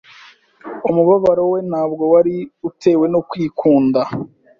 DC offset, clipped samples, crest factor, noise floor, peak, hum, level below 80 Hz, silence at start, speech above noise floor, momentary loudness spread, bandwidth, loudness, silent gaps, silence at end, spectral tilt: under 0.1%; under 0.1%; 14 dB; -45 dBFS; -2 dBFS; none; -56 dBFS; 0.65 s; 30 dB; 11 LU; 7.2 kHz; -16 LUFS; none; 0.3 s; -8.5 dB/octave